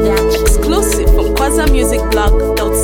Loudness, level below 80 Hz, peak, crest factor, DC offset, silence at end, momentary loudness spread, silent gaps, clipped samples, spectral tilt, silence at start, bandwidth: -13 LUFS; -14 dBFS; 0 dBFS; 10 dB; under 0.1%; 0 s; 1 LU; none; under 0.1%; -4.5 dB/octave; 0 s; 17.5 kHz